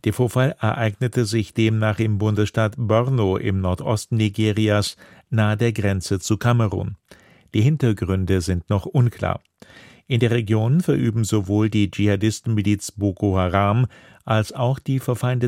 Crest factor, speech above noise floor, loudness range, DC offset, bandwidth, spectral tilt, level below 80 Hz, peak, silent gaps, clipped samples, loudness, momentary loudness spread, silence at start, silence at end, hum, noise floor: 18 dB; 27 dB; 2 LU; under 0.1%; 15 kHz; -6.5 dB/octave; -48 dBFS; -2 dBFS; none; under 0.1%; -21 LUFS; 5 LU; 0.05 s; 0 s; none; -47 dBFS